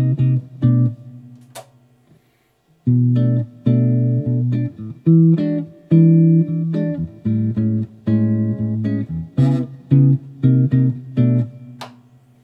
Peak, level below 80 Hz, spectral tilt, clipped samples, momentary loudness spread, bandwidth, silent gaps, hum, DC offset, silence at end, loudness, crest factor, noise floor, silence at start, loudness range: -2 dBFS; -56 dBFS; -11 dB/octave; under 0.1%; 11 LU; 4.7 kHz; none; none; under 0.1%; 0.55 s; -17 LUFS; 14 dB; -60 dBFS; 0 s; 5 LU